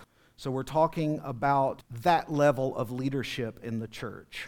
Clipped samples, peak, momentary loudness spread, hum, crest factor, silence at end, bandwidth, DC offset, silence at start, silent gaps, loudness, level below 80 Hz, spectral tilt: under 0.1%; -10 dBFS; 11 LU; none; 20 dB; 0 s; 19 kHz; under 0.1%; 0 s; none; -29 LUFS; -58 dBFS; -6.5 dB/octave